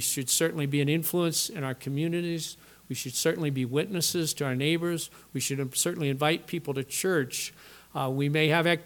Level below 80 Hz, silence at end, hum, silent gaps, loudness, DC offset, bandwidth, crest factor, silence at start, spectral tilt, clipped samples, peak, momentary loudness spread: -68 dBFS; 0 s; none; none; -28 LUFS; under 0.1%; 19 kHz; 20 dB; 0 s; -4 dB/octave; under 0.1%; -8 dBFS; 9 LU